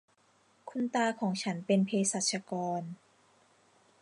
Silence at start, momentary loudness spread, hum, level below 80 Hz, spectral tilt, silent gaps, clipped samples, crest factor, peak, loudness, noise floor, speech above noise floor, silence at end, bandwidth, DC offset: 0.65 s; 15 LU; none; -84 dBFS; -4 dB/octave; none; under 0.1%; 18 dB; -16 dBFS; -32 LUFS; -68 dBFS; 36 dB; 1.05 s; 11.5 kHz; under 0.1%